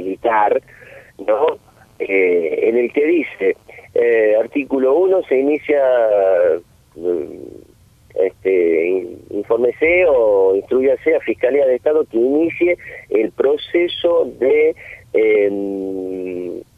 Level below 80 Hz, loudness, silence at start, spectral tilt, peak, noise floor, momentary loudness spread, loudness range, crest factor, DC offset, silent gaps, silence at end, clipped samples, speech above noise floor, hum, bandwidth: -54 dBFS; -16 LUFS; 0 s; -6.5 dB/octave; -4 dBFS; -49 dBFS; 11 LU; 3 LU; 14 dB; under 0.1%; none; 0.15 s; under 0.1%; 33 dB; none; 4.6 kHz